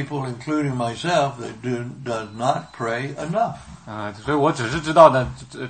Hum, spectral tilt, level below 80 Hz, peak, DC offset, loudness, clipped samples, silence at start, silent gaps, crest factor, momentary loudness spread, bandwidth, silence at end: none; -6 dB/octave; -50 dBFS; 0 dBFS; under 0.1%; -21 LUFS; under 0.1%; 0 s; none; 22 dB; 17 LU; 8.8 kHz; 0 s